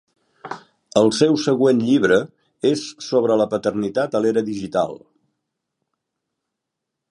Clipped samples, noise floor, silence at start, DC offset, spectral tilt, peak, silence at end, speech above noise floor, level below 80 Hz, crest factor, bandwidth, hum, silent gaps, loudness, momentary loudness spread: under 0.1%; -81 dBFS; 0.45 s; under 0.1%; -5.5 dB/octave; 0 dBFS; 2.15 s; 63 dB; -62 dBFS; 20 dB; 11 kHz; none; none; -19 LUFS; 14 LU